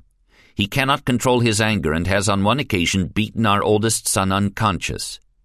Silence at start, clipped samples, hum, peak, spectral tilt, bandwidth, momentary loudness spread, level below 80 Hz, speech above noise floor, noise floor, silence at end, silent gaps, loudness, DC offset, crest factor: 0.6 s; under 0.1%; none; -2 dBFS; -4.5 dB/octave; 14.5 kHz; 7 LU; -38 dBFS; 36 dB; -55 dBFS; 0.3 s; none; -19 LUFS; under 0.1%; 18 dB